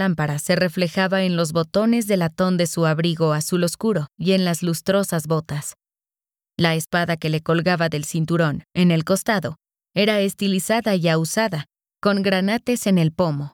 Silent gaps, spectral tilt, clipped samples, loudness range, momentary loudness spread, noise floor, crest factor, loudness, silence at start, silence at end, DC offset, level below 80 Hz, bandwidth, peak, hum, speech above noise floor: none; -5.5 dB/octave; under 0.1%; 3 LU; 5 LU; under -90 dBFS; 16 dB; -21 LUFS; 0 s; 0.05 s; under 0.1%; -56 dBFS; 18 kHz; -4 dBFS; none; over 70 dB